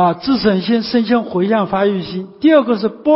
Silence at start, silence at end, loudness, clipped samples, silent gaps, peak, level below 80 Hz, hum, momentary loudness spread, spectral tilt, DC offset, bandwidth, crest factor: 0 s; 0 s; -15 LUFS; under 0.1%; none; -2 dBFS; -50 dBFS; none; 5 LU; -10.5 dB/octave; under 0.1%; 5.8 kHz; 14 dB